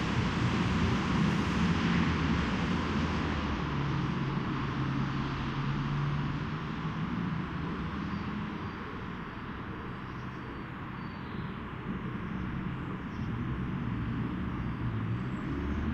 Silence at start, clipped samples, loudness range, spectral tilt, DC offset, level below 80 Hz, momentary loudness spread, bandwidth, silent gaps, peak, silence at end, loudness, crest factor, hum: 0 s; under 0.1%; 9 LU; -7 dB/octave; under 0.1%; -44 dBFS; 11 LU; 9.2 kHz; none; -16 dBFS; 0 s; -33 LUFS; 16 dB; none